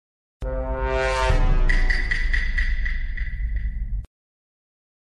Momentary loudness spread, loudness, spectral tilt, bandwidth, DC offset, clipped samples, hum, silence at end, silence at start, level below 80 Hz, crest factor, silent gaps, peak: 10 LU; -25 LUFS; -5.5 dB/octave; 9.4 kHz; under 0.1%; under 0.1%; none; 1 s; 0.4 s; -24 dBFS; 14 dB; none; -8 dBFS